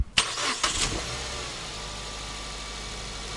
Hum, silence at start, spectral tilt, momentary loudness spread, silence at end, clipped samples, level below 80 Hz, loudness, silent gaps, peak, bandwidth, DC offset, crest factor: none; 0 s; -1.5 dB/octave; 10 LU; 0 s; under 0.1%; -42 dBFS; -29 LUFS; none; -2 dBFS; 12 kHz; under 0.1%; 28 dB